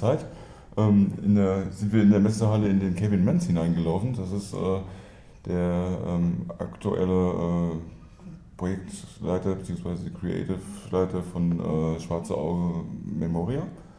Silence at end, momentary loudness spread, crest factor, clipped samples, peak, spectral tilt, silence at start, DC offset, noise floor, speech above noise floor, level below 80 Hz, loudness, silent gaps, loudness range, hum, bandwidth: 0.05 s; 13 LU; 18 dB; under 0.1%; -8 dBFS; -8.5 dB/octave; 0 s; under 0.1%; -45 dBFS; 20 dB; -48 dBFS; -26 LUFS; none; 8 LU; none; 11 kHz